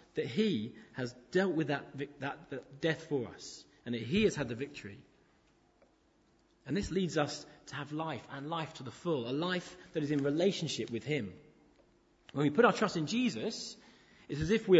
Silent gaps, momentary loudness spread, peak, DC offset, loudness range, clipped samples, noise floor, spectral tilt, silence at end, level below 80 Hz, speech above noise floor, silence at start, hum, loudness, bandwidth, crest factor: none; 14 LU; -10 dBFS; under 0.1%; 6 LU; under 0.1%; -69 dBFS; -5.5 dB/octave; 0 s; -62 dBFS; 36 dB; 0.15 s; none; -35 LUFS; 8 kHz; 24 dB